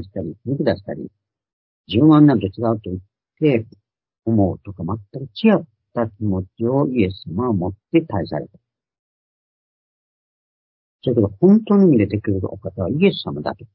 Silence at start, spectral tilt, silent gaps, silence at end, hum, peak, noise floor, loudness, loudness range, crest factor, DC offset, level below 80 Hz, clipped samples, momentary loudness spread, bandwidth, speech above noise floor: 0 s; -12.5 dB/octave; 1.53-1.84 s, 8.99-10.99 s; 0.1 s; none; -2 dBFS; under -90 dBFS; -19 LUFS; 8 LU; 18 dB; under 0.1%; -44 dBFS; under 0.1%; 16 LU; 5.6 kHz; over 72 dB